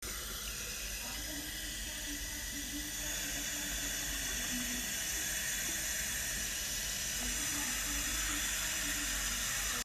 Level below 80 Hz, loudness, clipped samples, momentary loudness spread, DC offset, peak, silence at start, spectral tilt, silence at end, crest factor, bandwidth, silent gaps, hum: -48 dBFS; -35 LUFS; under 0.1%; 6 LU; under 0.1%; -22 dBFS; 0 s; -0.5 dB/octave; 0 s; 14 dB; 15.5 kHz; none; none